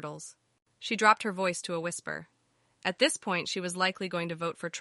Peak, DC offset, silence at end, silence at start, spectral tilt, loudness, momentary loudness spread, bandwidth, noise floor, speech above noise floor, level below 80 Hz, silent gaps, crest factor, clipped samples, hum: -8 dBFS; under 0.1%; 0 s; 0 s; -3 dB/octave; -30 LUFS; 17 LU; 11.5 kHz; -68 dBFS; 38 dB; -78 dBFS; none; 24 dB; under 0.1%; none